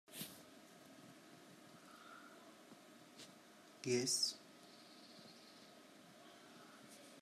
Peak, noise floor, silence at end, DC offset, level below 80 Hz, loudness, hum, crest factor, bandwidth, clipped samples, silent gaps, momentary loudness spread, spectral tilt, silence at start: -26 dBFS; -63 dBFS; 0 s; under 0.1%; under -90 dBFS; -40 LUFS; none; 24 dB; 15 kHz; under 0.1%; none; 23 LU; -2.5 dB/octave; 0.1 s